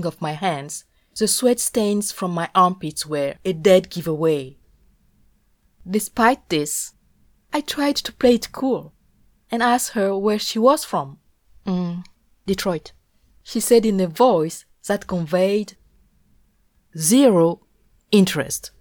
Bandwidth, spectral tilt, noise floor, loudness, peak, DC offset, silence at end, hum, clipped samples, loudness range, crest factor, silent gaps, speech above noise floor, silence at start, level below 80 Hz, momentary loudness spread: over 20 kHz; -4.5 dB/octave; -61 dBFS; -20 LUFS; -4 dBFS; under 0.1%; 0.1 s; none; under 0.1%; 4 LU; 18 dB; none; 42 dB; 0 s; -54 dBFS; 13 LU